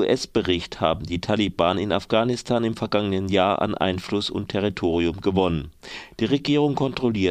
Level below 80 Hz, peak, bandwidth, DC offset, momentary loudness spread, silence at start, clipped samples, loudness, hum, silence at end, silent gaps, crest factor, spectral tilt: -46 dBFS; -2 dBFS; 12.5 kHz; under 0.1%; 5 LU; 0 s; under 0.1%; -23 LUFS; none; 0 s; none; 20 dB; -6 dB/octave